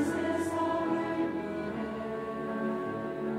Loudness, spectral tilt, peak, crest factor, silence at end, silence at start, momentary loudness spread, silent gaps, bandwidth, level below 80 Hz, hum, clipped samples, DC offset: -33 LUFS; -6 dB/octave; -20 dBFS; 14 dB; 0 s; 0 s; 5 LU; none; 14 kHz; -64 dBFS; none; under 0.1%; under 0.1%